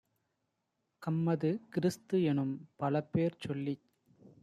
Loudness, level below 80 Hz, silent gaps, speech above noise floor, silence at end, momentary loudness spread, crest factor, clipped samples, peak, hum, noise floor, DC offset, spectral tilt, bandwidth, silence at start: -34 LUFS; -74 dBFS; none; 50 dB; 0.15 s; 7 LU; 16 dB; under 0.1%; -18 dBFS; none; -83 dBFS; under 0.1%; -8 dB/octave; 14 kHz; 1 s